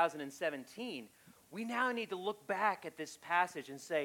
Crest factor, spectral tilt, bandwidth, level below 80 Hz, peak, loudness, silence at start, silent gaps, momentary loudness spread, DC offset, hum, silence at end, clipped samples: 20 dB; -3.5 dB/octave; 17 kHz; -86 dBFS; -18 dBFS; -38 LUFS; 0 s; none; 13 LU; under 0.1%; none; 0 s; under 0.1%